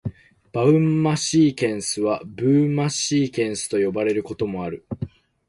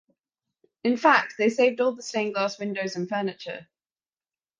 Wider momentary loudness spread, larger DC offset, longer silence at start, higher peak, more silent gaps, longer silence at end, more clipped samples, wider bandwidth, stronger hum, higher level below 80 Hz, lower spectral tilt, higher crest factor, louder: about the same, 13 LU vs 12 LU; neither; second, 0.05 s vs 0.85 s; about the same, -6 dBFS vs -4 dBFS; neither; second, 0.4 s vs 0.95 s; neither; first, 11.5 kHz vs 9.6 kHz; neither; first, -52 dBFS vs -76 dBFS; about the same, -5.5 dB/octave vs -4.5 dB/octave; second, 16 dB vs 22 dB; first, -21 LUFS vs -24 LUFS